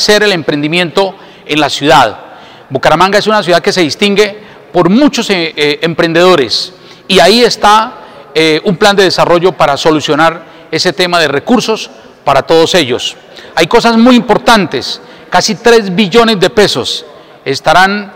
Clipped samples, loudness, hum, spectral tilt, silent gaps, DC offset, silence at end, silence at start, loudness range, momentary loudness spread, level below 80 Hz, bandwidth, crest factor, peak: 2%; -8 LUFS; none; -4 dB/octave; none; 0.8%; 0 s; 0 s; 2 LU; 10 LU; -40 dBFS; 16.5 kHz; 10 dB; 0 dBFS